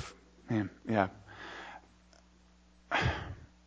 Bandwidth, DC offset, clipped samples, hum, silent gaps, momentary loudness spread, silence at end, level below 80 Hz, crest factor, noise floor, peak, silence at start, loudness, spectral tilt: 8 kHz; under 0.1%; under 0.1%; none; none; 17 LU; 0.2 s; -52 dBFS; 26 dB; -63 dBFS; -10 dBFS; 0 s; -35 LUFS; -6 dB/octave